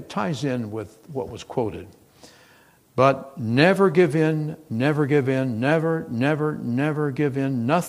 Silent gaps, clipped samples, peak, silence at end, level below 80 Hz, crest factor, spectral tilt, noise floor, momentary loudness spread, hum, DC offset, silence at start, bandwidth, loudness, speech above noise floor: none; under 0.1%; 0 dBFS; 0 s; -60 dBFS; 22 dB; -7 dB/octave; -55 dBFS; 14 LU; none; under 0.1%; 0 s; 15.5 kHz; -22 LUFS; 33 dB